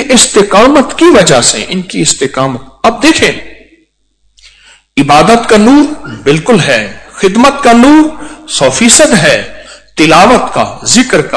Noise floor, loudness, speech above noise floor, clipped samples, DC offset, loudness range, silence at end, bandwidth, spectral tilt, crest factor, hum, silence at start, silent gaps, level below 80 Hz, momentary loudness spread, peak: -55 dBFS; -6 LUFS; 49 dB; 10%; under 0.1%; 5 LU; 0 s; 11 kHz; -3.5 dB/octave; 8 dB; none; 0 s; none; -34 dBFS; 11 LU; 0 dBFS